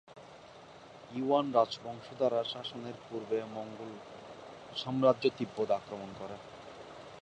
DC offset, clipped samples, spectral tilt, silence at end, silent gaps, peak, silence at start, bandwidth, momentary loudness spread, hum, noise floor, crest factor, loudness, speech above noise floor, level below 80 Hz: under 0.1%; under 0.1%; -6 dB/octave; 0.05 s; none; -12 dBFS; 0.1 s; 9.8 kHz; 24 LU; none; -53 dBFS; 22 dB; -34 LUFS; 20 dB; -72 dBFS